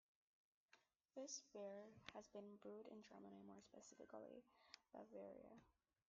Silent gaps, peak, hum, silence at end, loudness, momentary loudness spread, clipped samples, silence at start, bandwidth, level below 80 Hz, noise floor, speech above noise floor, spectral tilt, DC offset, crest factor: none; -36 dBFS; none; 0.4 s; -60 LUFS; 10 LU; under 0.1%; 0.7 s; 7.4 kHz; under -90 dBFS; -80 dBFS; 20 dB; -4 dB/octave; under 0.1%; 26 dB